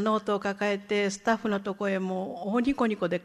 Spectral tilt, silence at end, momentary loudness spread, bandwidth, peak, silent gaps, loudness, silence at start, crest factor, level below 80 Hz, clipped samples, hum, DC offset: -5.5 dB/octave; 0 s; 4 LU; 12 kHz; -12 dBFS; none; -28 LUFS; 0 s; 16 dB; -60 dBFS; under 0.1%; none; under 0.1%